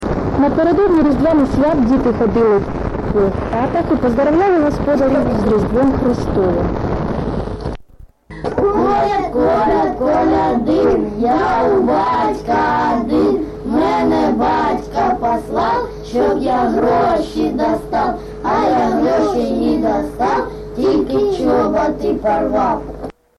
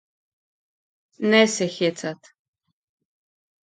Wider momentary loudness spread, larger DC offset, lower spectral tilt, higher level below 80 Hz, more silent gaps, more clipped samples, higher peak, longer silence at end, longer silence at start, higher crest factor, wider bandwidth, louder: second, 6 LU vs 16 LU; neither; first, -7.5 dB/octave vs -3.5 dB/octave; first, -32 dBFS vs -74 dBFS; neither; neither; about the same, -4 dBFS vs -4 dBFS; second, 0.25 s vs 1.5 s; second, 0 s vs 1.2 s; second, 12 dB vs 22 dB; first, 12 kHz vs 9.4 kHz; first, -15 LUFS vs -21 LUFS